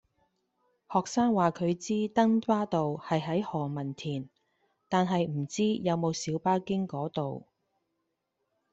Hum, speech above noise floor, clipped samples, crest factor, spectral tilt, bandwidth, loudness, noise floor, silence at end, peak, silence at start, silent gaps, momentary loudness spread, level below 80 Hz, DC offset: none; 52 dB; under 0.1%; 20 dB; -6 dB/octave; 8.2 kHz; -30 LUFS; -81 dBFS; 1.35 s; -12 dBFS; 0.9 s; none; 10 LU; -68 dBFS; under 0.1%